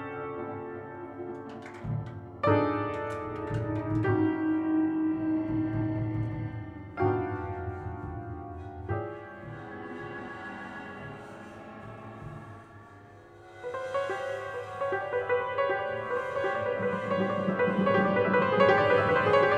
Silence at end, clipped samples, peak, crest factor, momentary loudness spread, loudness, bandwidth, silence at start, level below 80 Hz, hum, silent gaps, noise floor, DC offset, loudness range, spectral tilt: 0 s; under 0.1%; -8 dBFS; 22 dB; 18 LU; -30 LUFS; 9.4 kHz; 0 s; -56 dBFS; none; none; -51 dBFS; under 0.1%; 14 LU; -8 dB/octave